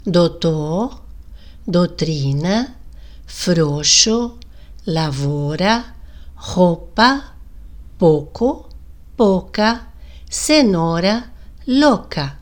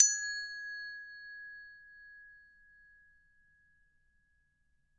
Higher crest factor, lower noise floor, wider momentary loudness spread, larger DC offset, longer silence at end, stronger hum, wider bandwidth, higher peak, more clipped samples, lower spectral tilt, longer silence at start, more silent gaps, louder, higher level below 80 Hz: second, 18 dB vs 32 dB; second, -38 dBFS vs -74 dBFS; second, 14 LU vs 19 LU; first, 0.8% vs under 0.1%; second, 0 s vs 2.6 s; neither; first, 19 kHz vs 9.6 kHz; first, 0 dBFS vs -8 dBFS; neither; first, -4.5 dB/octave vs 6 dB/octave; about the same, 0.05 s vs 0 s; neither; first, -17 LUFS vs -36 LUFS; first, -38 dBFS vs -76 dBFS